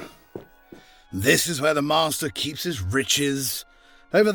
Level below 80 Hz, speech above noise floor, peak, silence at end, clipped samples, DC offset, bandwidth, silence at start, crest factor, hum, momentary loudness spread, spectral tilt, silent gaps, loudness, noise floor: -54 dBFS; 26 dB; -4 dBFS; 0 s; under 0.1%; under 0.1%; 19 kHz; 0 s; 20 dB; none; 20 LU; -3 dB/octave; none; -22 LUFS; -49 dBFS